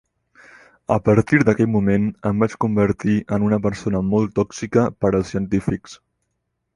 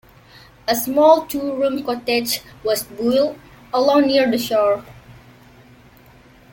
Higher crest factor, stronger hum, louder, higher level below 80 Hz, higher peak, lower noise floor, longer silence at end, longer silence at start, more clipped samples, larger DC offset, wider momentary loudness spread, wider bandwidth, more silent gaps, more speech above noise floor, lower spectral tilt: about the same, 18 dB vs 18 dB; first, 60 Hz at -50 dBFS vs none; about the same, -20 LUFS vs -18 LUFS; first, -44 dBFS vs -54 dBFS; about the same, -2 dBFS vs -2 dBFS; first, -75 dBFS vs -48 dBFS; second, 0.8 s vs 1.4 s; first, 0.9 s vs 0.65 s; neither; neither; second, 6 LU vs 10 LU; second, 11 kHz vs 17 kHz; neither; first, 56 dB vs 30 dB; first, -8 dB/octave vs -3.5 dB/octave